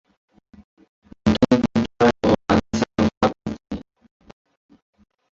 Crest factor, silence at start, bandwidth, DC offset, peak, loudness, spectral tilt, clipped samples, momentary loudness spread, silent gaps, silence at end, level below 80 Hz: 20 dB; 1.25 s; 7.6 kHz; under 0.1%; -4 dBFS; -20 LUFS; -6.5 dB/octave; under 0.1%; 15 LU; 3.17-3.21 s; 1.55 s; -42 dBFS